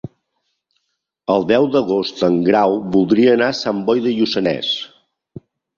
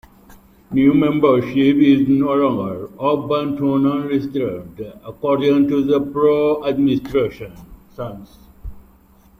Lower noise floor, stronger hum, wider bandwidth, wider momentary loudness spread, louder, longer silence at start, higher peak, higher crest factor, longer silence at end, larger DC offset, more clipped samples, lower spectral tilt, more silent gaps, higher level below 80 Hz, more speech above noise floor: first, -74 dBFS vs -50 dBFS; neither; second, 7.4 kHz vs 15 kHz; second, 8 LU vs 17 LU; about the same, -16 LUFS vs -17 LUFS; second, 0.05 s vs 0.7 s; about the same, -2 dBFS vs -2 dBFS; about the same, 16 dB vs 16 dB; first, 0.9 s vs 0.6 s; neither; neither; second, -6 dB/octave vs -8.5 dB/octave; neither; second, -56 dBFS vs -46 dBFS; first, 58 dB vs 33 dB